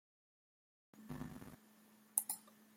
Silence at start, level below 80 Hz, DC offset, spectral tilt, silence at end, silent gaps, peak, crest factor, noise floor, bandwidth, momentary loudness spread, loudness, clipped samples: 0.95 s; -72 dBFS; under 0.1%; -3 dB/octave; 0 s; none; -12 dBFS; 38 dB; -67 dBFS; 16.5 kHz; 22 LU; -43 LUFS; under 0.1%